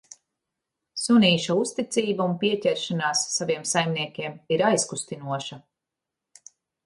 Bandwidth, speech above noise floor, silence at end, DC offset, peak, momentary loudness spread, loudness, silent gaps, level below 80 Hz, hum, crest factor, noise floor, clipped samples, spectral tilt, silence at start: 11.5 kHz; 62 dB; 1.25 s; under 0.1%; -8 dBFS; 12 LU; -24 LUFS; none; -70 dBFS; none; 18 dB; -86 dBFS; under 0.1%; -4 dB/octave; 0.95 s